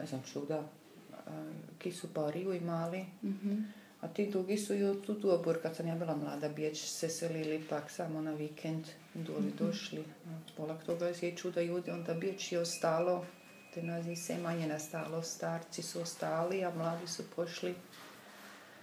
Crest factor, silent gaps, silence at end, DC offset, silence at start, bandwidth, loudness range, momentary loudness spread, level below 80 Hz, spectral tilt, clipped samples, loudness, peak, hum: 20 dB; none; 0 s; under 0.1%; 0 s; 19.5 kHz; 4 LU; 14 LU; -90 dBFS; -5 dB/octave; under 0.1%; -38 LUFS; -18 dBFS; none